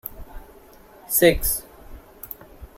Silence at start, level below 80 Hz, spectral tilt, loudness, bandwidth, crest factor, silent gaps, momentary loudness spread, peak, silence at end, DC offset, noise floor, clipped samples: 0.05 s; -38 dBFS; -3.5 dB/octave; -20 LUFS; 16.5 kHz; 22 dB; none; 23 LU; -2 dBFS; 0.1 s; under 0.1%; -48 dBFS; under 0.1%